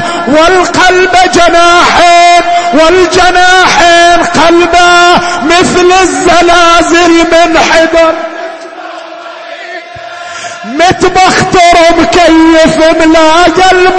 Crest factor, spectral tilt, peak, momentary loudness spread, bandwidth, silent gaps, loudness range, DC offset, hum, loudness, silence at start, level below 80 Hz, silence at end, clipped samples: 4 dB; -3 dB/octave; 0 dBFS; 18 LU; 11 kHz; none; 7 LU; under 0.1%; none; -4 LUFS; 0 s; -28 dBFS; 0 s; 5%